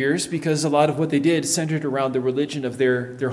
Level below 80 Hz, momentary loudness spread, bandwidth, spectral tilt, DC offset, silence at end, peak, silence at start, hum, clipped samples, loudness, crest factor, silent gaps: -64 dBFS; 4 LU; 12 kHz; -5 dB/octave; under 0.1%; 0 s; -4 dBFS; 0 s; none; under 0.1%; -21 LUFS; 18 dB; none